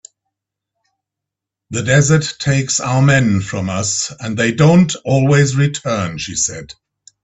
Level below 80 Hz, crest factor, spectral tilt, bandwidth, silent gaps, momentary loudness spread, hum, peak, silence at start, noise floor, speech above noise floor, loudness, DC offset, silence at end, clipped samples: -46 dBFS; 16 dB; -5 dB/octave; 8.4 kHz; none; 9 LU; none; 0 dBFS; 1.7 s; -83 dBFS; 68 dB; -15 LUFS; under 0.1%; 0.5 s; under 0.1%